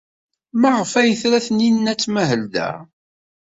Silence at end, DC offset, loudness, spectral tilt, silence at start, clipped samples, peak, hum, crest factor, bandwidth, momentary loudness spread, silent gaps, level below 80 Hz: 0.7 s; under 0.1%; -18 LUFS; -4.5 dB/octave; 0.55 s; under 0.1%; -4 dBFS; none; 16 dB; 8 kHz; 9 LU; none; -60 dBFS